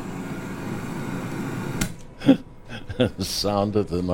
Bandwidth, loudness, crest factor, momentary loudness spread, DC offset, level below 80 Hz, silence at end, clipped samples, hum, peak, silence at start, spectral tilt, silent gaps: 17 kHz; -26 LUFS; 24 dB; 12 LU; under 0.1%; -42 dBFS; 0 s; under 0.1%; none; -2 dBFS; 0 s; -5.5 dB/octave; none